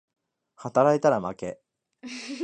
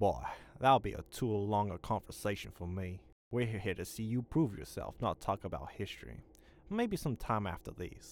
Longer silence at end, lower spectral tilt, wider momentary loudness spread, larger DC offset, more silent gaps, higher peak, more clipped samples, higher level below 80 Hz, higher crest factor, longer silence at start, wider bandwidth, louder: about the same, 0 s vs 0 s; about the same, -6 dB/octave vs -6.5 dB/octave; first, 19 LU vs 12 LU; neither; second, none vs 3.12-3.31 s; first, -6 dBFS vs -16 dBFS; neither; second, -66 dBFS vs -54 dBFS; about the same, 20 dB vs 22 dB; first, 0.6 s vs 0 s; second, 9.6 kHz vs 18.5 kHz; first, -23 LUFS vs -37 LUFS